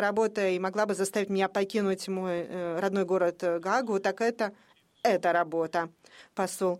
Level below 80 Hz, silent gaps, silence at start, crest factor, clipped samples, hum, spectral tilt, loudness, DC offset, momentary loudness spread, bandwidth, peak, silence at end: -74 dBFS; none; 0 s; 16 dB; under 0.1%; none; -5 dB/octave; -29 LUFS; under 0.1%; 6 LU; 15.5 kHz; -12 dBFS; 0 s